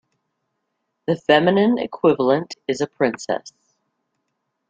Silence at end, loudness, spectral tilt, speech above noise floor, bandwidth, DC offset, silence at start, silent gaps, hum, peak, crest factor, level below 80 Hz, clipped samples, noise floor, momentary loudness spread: 1.2 s; -20 LUFS; -5.5 dB/octave; 57 dB; 9.2 kHz; under 0.1%; 1.1 s; none; none; -2 dBFS; 20 dB; -64 dBFS; under 0.1%; -75 dBFS; 11 LU